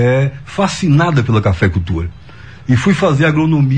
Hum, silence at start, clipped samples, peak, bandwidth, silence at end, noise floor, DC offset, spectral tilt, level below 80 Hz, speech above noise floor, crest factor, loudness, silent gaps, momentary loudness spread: none; 0 s; under 0.1%; -2 dBFS; 9.6 kHz; 0 s; -35 dBFS; 0.9%; -7 dB/octave; -34 dBFS; 23 dB; 12 dB; -14 LUFS; none; 9 LU